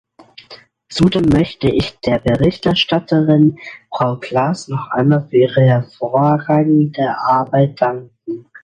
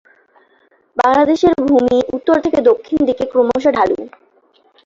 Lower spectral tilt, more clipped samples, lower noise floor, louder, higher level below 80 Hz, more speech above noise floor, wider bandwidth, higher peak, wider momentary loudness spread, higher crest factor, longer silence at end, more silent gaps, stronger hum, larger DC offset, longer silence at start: first, -7.5 dB/octave vs -6 dB/octave; neither; second, -42 dBFS vs -55 dBFS; about the same, -15 LUFS vs -14 LUFS; first, -42 dBFS vs -48 dBFS; second, 28 dB vs 42 dB; first, 10.5 kHz vs 7.6 kHz; about the same, 0 dBFS vs -2 dBFS; first, 9 LU vs 5 LU; about the same, 14 dB vs 14 dB; second, 0.25 s vs 0.8 s; neither; neither; neither; second, 0.5 s vs 0.95 s